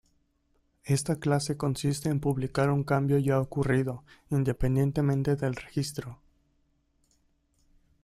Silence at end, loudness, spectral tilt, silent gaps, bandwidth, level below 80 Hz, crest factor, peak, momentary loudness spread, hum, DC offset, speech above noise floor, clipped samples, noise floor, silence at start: 1.9 s; -28 LUFS; -6.5 dB/octave; none; 14 kHz; -48 dBFS; 18 dB; -12 dBFS; 8 LU; none; under 0.1%; 43 dB; under 0.1%; -71 dBFS; 0.85 s